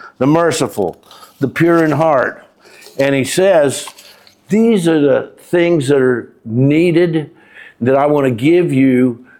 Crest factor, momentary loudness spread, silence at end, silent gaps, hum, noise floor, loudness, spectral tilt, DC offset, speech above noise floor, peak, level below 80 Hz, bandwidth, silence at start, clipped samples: 12 dB; 10 LU; 0.2 s; none; none; -42 dBFS; -13 LUFS; -6 dB/octave; under 0.1%; 29 dB; -2 dBFS; -56 dBFS; 16.5 kHz; 0.05 s; under 0.1%